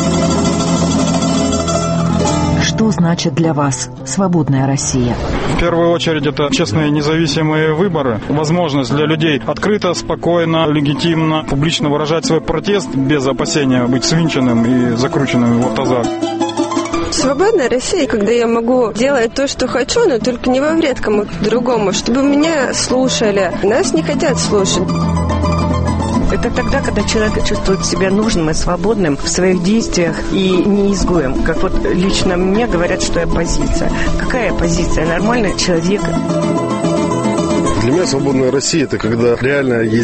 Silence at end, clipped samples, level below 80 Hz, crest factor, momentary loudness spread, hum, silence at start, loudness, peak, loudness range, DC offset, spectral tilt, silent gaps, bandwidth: 0 s; under 0.1%; -26 dBFS; 12 dB; 3 LU; none; 0 s; -14 LUFS; -2 dBFS; 1 LU; under 0.1%; -5 dB/octave; none; 8.8 kHz